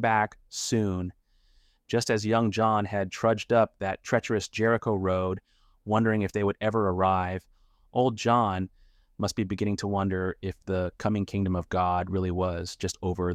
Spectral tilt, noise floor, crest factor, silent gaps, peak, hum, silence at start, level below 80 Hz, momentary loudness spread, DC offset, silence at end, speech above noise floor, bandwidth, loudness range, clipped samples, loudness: -6 dB/octave; -63 dBFS; 18 dB; none; -10 dBFS; none; 0 s; -54 dBFS; 9 LU; under 0.1%; 0 s; 36 dB; 15 kHz; 3 LU; under 0.1%; -28 LUFS